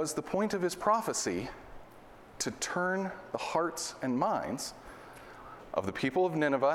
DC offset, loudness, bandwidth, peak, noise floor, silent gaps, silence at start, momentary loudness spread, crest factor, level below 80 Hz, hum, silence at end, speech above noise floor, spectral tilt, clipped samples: under 0.1%; -32 LUFS; 17 kHz; -14 dBFS; -53 dBFS; none; 0 s; 20 LU; 20 dB; -62 dBFS; none; 0 s; 21 dB; -4 dB/octave; under 0.1%